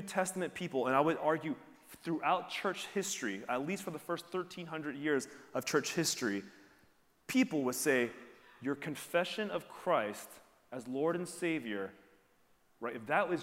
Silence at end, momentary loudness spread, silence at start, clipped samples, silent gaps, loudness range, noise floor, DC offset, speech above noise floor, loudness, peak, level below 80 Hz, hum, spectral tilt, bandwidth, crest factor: 0 s; 12 LU; 0 s; under 0.1%; none; 3 LU; -69 dBFS; under 0.1%; 34 dB; -36 LUFS; -16 dBFS; -80 dBFS; none; -4 dB/octave; 16 kHz; 20 dB